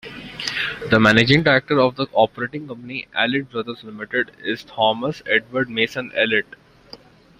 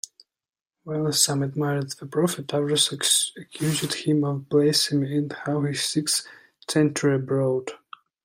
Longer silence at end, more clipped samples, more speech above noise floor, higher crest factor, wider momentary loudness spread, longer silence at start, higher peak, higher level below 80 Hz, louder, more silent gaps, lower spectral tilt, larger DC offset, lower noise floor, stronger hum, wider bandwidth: about the same, 0.45 s vs 0.5 s; neither; second, 25 dB vs over 66 dB; about the same, 20 dB vs 20 dB; first, 16 LU vs 9 LU; second, 0.05 s vs 0.85 s; first, 0 dBFS vs -4 dBFS; first, -52 dBFS vs -68 dBFS; first, -19 LUFS vs -23 LUFS; neither; first, -5.5 dB/octave vs -4 dB/octave; neither; second, -45 dBFS vs under -90 dBFS; neither; second, 14.5 kHz vs 16 kHz